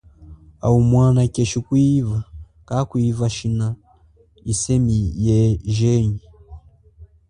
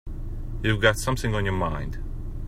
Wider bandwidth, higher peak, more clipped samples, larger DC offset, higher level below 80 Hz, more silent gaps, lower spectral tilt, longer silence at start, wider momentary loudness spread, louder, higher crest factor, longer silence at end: second, 11 kHz vs 15.5 kHz; about the same, -4 dBFS vs -4 dBFS; neither; neither; second, -38 dBFS vs -32 dBFS; neither; first, -7 dB/octave vs -5 dB/octave; first, 0.2 s vs 0.05 s; second, 11 LU vs 15 LU; first, -19 LUFS vs -25 LUFS; second, 16 dB vs 22 dB; first, 0.25 s vs 0 s